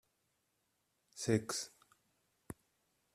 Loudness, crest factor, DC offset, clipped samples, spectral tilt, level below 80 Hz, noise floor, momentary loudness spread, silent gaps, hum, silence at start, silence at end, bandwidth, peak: -38 LUFS; 28 dB; under 0.1%; under 0.1%; -4.5 dB/octave; -74 dBFS; -82 dBFS; 19 LU; none; none; 1.15 s; 0.6 s; 15 kHz; -18 dBFS